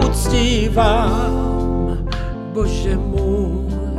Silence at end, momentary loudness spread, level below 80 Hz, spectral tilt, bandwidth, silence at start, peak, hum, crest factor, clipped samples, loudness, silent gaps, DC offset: 0 s; 8 LU; -20 dBFS; -6 dB/octave; 14 kHz; 0 s; -2 dBFS; none; 14 dB; under 0.1%; -19 LUFS; none; under 0.1%